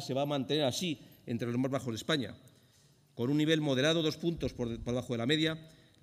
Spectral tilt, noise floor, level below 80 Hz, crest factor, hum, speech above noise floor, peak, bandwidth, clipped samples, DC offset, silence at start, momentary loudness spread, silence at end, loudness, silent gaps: -5 dB/octave; -65 dBFS; -58 dBFS; 18 dB; none; 33 dB; -14 dBFS; 15.5 kHz; under 0.1%; under 0.1%; 0 s; 9 LU; 0.35 s; -32 LUFS; none